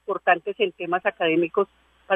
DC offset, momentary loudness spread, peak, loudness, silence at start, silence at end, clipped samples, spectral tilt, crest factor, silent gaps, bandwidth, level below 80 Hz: under 0.1%; 5 LU; -6 dBFS; -23 LUFS; 0.1 s; 0 s; under 0.1%; -7.5 dB/octave; 18 dB; none; 3.8 kHz; -68 dBFS